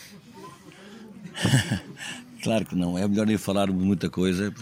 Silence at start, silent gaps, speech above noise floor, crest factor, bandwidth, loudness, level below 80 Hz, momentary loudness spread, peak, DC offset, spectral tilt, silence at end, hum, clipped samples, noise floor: 0 s; none; 22 dB; 20 dB; 16 kHz; -26 LUFS; -58 dBFS; 22 LU; -6 dBFS; under 0.1%; -5.5 dB/octave; 0 s; none; under 0.1%; -46 dBFS